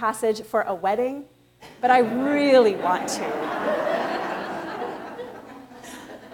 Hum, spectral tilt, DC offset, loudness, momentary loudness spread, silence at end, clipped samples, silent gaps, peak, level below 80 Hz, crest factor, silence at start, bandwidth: none; -4 dB/octave; under 0.1%; -23 LUFS; 22 LU; 0 s; under 0.1%; none; -6 dBFS; -66 dBFS; 18 dB; 0 s; 18 kHz